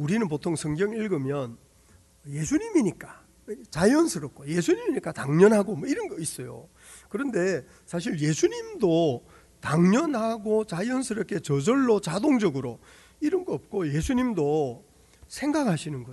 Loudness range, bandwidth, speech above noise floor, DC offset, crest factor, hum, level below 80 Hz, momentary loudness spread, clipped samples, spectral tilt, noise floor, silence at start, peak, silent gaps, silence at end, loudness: 4 LU; 12 kHz; 32 dB; under 0.1%; 20 dB; none; -54 dBFS; 15 LU; under 0.1%; -6 dB/octave; -57 dBFS; 0 s; -6 dBFS; none; 0 s; -26 LUFS